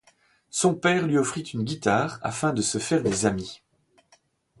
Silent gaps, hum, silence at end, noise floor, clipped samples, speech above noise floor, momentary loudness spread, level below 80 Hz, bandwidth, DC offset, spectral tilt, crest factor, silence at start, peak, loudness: none; none; 1.05 s; -63 dBFS; under 0.1%; 39 dB; 8 LU; -56 dBFS; 11.5 kHz; under 0.1%; -4.5 dB/octave; 20 dB; 0.55 s; -6 dBFS; -25 LUFS